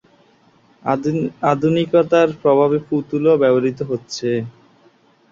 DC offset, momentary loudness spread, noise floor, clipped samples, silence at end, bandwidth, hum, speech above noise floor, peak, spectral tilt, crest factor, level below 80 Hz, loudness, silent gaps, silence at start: under 0.1%; 10 LU; -54 dBFS; under 0.1%; 0.8 s; 7.4 kHz; none; 37 dB; -2 dBFS; -7 dB/octave; 16 dB; -58 dBFS; -17 LUFS; none; 0.85 s